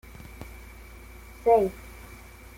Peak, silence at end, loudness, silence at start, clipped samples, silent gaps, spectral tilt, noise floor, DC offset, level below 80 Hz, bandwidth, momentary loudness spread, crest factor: -10 dBFS; 0.65 s; -24 LUFS; 0.4 s; under 0.1%; none; -6.5 dB/octave; -46 dBFS; under 0.1%; -48 dBFS; 16.5 kHz; 25 LU; 20 dB